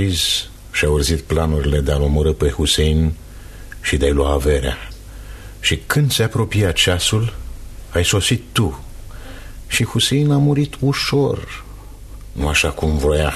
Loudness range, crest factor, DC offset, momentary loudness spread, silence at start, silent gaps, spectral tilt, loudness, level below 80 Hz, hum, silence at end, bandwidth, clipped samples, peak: 2 LU; 16 dB; under 0.1%; 21 LU; 0 s; none; -4.5 dB/octave; -17 LUFS; -26 dBFS; none; 0 s; 13.5 kHz; under 0.1%; -2 dBFS